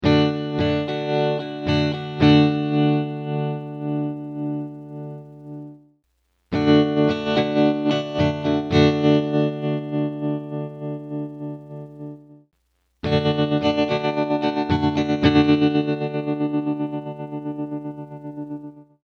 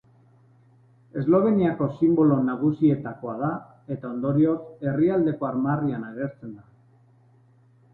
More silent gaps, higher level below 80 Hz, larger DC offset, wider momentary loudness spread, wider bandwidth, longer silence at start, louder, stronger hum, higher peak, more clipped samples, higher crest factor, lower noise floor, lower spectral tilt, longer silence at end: neither; first, -50 dBFS vs -60 dBFS; neither; first, 18 LU vs 14 LU; first, 6.6 kHz vs 4.1 kHz; second, 0 s vs 1.15 s; first, -21 LUFS vs -24 LUFS; neither; first, -4 dBFS vs -8 dBFS; neither; about the same, 18 dB vs 18 dB; first, -69 dBFS vs -57 dBFS; second, -7.5 dB/octave vs -12 dB/octave; second, 0.25 s vs 1.35 s